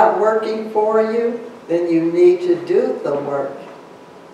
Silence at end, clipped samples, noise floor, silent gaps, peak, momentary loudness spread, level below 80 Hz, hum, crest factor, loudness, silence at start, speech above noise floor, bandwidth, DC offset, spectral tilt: 0.05 s; under 0.1%; -40 dBFS; none; -2 dBFS; 12 LU; -74 dBFS; none; 16 dB; -17 LUFS; 0 s; 23 dB; 9 kHz; under 0.1%; -7 dB/octave